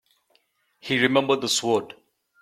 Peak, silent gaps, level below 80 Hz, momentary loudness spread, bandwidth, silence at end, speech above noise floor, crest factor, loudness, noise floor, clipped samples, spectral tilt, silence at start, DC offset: -4 dBFS; none; -68 dBFS; 17 LU; 15 kHz; 0.5 s; 45 dB; 22 dB; -22 LUFS; -67 dBFS; under 0.1%; -3 dB/octave; 0.85 s; under 0.1%